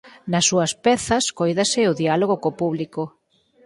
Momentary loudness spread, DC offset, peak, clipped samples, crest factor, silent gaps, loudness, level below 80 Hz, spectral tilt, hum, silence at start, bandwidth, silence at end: 9 LU; under 0.1%; -4 dBFS; under 0.1%; 16 dB; none; -20 LUFS; -54 dBFS; -4 dB/octave; none; 0.05 s; 11.5 kHz; 0.55 s